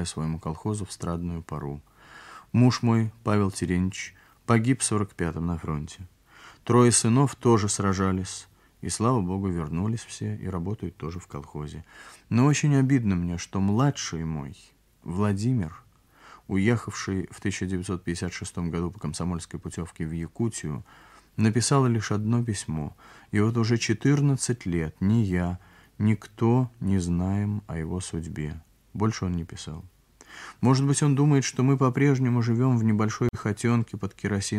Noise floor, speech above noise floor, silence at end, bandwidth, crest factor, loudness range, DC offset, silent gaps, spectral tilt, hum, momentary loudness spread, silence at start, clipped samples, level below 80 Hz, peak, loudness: -54 dBFS; 28 dB; 0 s; 12.5 kHz; 20 dB; 7 LU; under 0.1%; none; -6 dB/octave; none; 15 LU; 0 s; under 0.1%; -50 dBFS; -6 dBFS; -26 LUFS